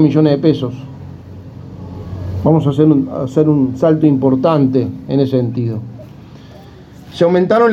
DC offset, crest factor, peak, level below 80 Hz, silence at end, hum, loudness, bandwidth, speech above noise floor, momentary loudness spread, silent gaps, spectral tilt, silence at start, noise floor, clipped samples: under 0.1%; 14 dB; 0 dBFS; -48 dBFS; 0 s; none; -14 LUFS; 7.6 kHz; 24 dB; 21 LU; none; -9 dB/octave; 0 s; -37 dBFS; under 0.1%